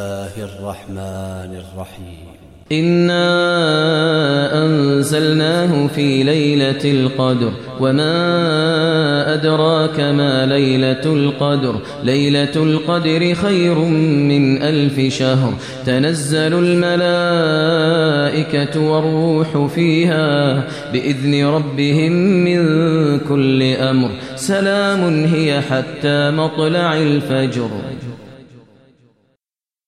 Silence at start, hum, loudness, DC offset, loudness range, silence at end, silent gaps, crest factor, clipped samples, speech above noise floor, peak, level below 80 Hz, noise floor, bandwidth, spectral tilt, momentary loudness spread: 0 s; none; -15 LUFS; 0.2%; 3 LU; 1.45 s; none; 12 dB; under 0.1%; over 75 dB; -2 dBFS; -52 dBFS; under -90 dBFS; 13 kHz; -6.5 dB/octave; 8 LU